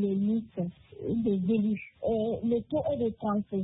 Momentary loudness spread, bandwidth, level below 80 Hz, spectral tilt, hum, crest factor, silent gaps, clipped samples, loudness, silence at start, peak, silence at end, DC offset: 8 LU; 4 kHz; -58 dBFS; -12 dB/octave; none; 12 dB; none; under 0.1%; -30 LUFS; 0 s; -18 dBFS; 0 s; under 0.1%